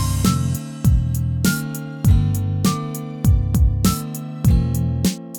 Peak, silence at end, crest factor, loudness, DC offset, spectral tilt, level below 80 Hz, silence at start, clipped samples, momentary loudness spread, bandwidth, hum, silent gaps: -4 dBFS; 0 s; 14 dB; -20 LUFS; under 0.1%; -6 dB/octave; -24 dBFS; 0 s; under 0.1%; 7 LU; over 20 kHz; none; none